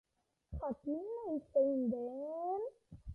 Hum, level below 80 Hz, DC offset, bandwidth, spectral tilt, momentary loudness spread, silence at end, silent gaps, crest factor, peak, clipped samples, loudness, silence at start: none; -58 dBFS; under 0.1%; 2.1 kHz; -11.5 dB/octave; 12 LU; 0 s; none; 16 dB; -22 dBFS; under 0.1%; -38 LUFS; 0.5 s